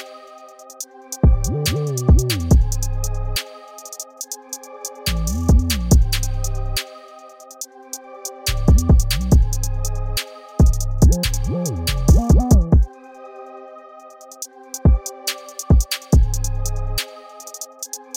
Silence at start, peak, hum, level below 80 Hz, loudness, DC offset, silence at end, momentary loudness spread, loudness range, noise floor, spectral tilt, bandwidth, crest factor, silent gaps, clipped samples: 0 s; -2 dBFS; none; -20 dBFS; -19 LUFS; under 0.1%; 0.2 s; 19 LU; 5 LU; -41 dBFS; -5 dB/octave; 18 kHz; 16 dB; none; under 0.1%